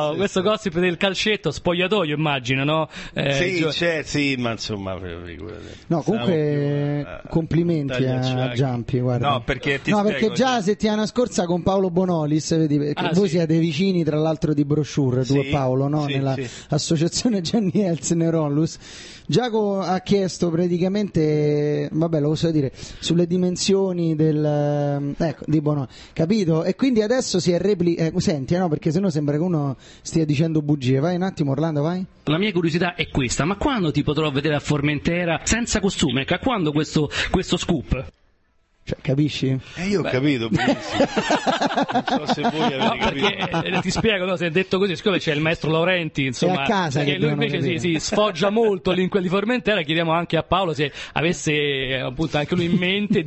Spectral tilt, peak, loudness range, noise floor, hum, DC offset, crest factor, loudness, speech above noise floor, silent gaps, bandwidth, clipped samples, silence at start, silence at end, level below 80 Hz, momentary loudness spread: -5.5 dB/octave; -4 dBFS; 2 LU; -62 dBFS; none; under 0.1%; 18 dB; -21 LUFS; 41 dB; none; 8.6 kHz; under 0.1%; 0 s; 0 s; -44 dBFS; 5 LU